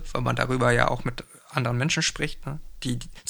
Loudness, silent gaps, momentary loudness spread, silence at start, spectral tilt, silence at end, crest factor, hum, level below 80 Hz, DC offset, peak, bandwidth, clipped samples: -26 LUFS; none; 13 LU; 0 s; -4.5 dB/octave; 0 s; 24 dB; none; -40 dBFS; under 0.1%; -2 dBFS; over 20 kHz; under 0.1%